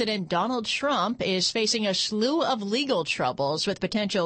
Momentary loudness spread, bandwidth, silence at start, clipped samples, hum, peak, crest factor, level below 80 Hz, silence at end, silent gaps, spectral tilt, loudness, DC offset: 3 LU; 8.8 kHz; 0 s; under 0.1%; none; -10 dBFS; 14 dB; -62 dBFS; 0 s; none; -3.5 dB/octave; -25 LUFS; under 0.1%